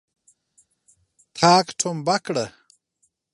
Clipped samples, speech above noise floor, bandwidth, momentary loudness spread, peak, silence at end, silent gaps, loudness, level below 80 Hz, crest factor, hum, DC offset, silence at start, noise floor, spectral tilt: under 0.1%; 50 dB; 11.5 kHz; 15 LU; 0 dBFS; 0.85 s; none; -21 LUFS; -66 dBFS; 24 dB; none; under 0.1%; 1.35 s; -70 dBFS; -3.5 dB/octave